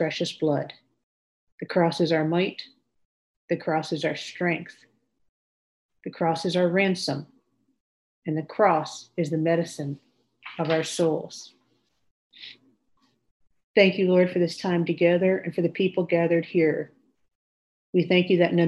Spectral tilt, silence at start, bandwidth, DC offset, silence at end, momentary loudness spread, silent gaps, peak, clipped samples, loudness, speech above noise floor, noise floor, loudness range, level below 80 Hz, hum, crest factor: -6 dB/octave; 0 s; 12 kHz; under 0.1%; 0 s; 19 LU; 1.03-1.58 s, 3.05-3.48 s, 5.29-5.89 s, 7.80-8.22 s, 12.11-12.30 s, 13.31-13.40 s, 13.64-13.74 s, 17.35-17.93 s; -4 dBFS; under 0.1%; -24 LUFS; 46 dB; -70 dBFS; 8 LU; -74 dBFS; none; 22 dB